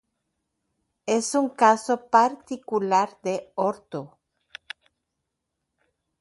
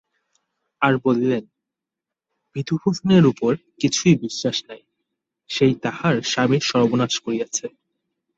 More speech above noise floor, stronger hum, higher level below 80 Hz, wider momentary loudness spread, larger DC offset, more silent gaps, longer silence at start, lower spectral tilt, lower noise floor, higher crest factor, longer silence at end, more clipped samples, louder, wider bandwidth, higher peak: second, 58 dB vs 67 dB; neither; second, -74 dBFS vs -58 dBFS; first, 19 LU vs 10 LU; neither; neither; first, 1.05 s vs 0.8 s; about the same, -4 dB/octave vs -5 dB/octave; second, -81 dBFS vs -86 dBFS; about the same, 22 dB vs 20 dB; first, 2.15 s vs 0.7 s; neither; second, -23 LUFS vs -20 LUFS; first, 11.5 kHz vs 8.2 kHz; about the same, -4 dBFS vs -2 dBFS